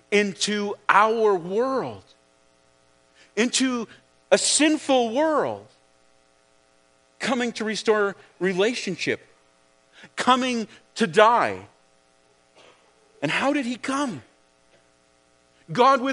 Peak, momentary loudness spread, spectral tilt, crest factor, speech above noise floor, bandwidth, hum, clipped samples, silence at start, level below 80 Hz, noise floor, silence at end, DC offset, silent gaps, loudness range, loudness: 0 dBFS; 13 LU; -3 dB/octave; 24 dB; 39 dB; 10.5 kHz; none; under 0.1%; 0.1 s; -74 dBFS; -61 dBFS; 0 s; under 0.1%; none; 6 LU; -22 LUFS